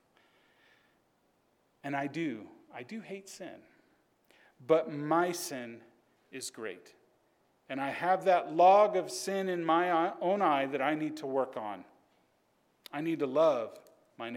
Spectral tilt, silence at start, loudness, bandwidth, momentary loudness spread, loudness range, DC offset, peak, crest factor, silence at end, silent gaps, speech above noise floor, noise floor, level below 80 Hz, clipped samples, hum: -4.5 dB/octave; 1.85 s; -30 LUFS; 17.5 kHz; 19 LU; 14 LU; under 0.1%; -12 dBFS; 20 dB; 0 s; none; 42 dB; -72 dBFS; -90 dBFS; under 0.1%; none